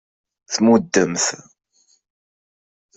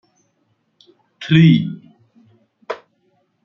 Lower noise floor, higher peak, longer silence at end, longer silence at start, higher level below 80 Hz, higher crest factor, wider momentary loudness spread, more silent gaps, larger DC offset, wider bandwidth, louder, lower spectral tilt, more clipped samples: first, under -90 dBFS vs -66 dBFS; about the same, -2 dBFS vs -2 dBFS; first, 1.6 s vs 0.7 s; second, 0.5 s vs 1.2 s; about the same, -62 dBFS vs -58 dBFS; about the same, 20 dB vs 18 dB; second, 11 LU vs 22 LU; neither; neither; first, 8.4 kHz vs 6 kHz; second, -18 LUFS vs -14 LUFS; second, -3.5 dB/octave vs -8 dB/octave; neither